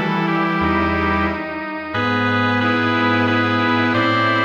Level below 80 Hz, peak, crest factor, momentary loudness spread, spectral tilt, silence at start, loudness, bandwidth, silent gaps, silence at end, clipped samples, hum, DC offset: -40 dBFS; -6 dBFS; 12 dB; 5 LU; -7 dB/octave; 0 s; -18 LUFS; 18.5 kHz; none; 0 s; under 0.1%; none; under 0.1%